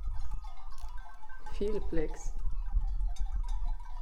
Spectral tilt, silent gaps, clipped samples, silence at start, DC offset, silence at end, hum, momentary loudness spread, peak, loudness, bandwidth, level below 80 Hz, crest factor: -6.5 dB/octave; none; under 0.1%; 0 s; under 0.1%; 0 s; none; 13 LU; -16 dBFS; -40 LUFS; 7.8 kHz; -34 dBFS; 14 dB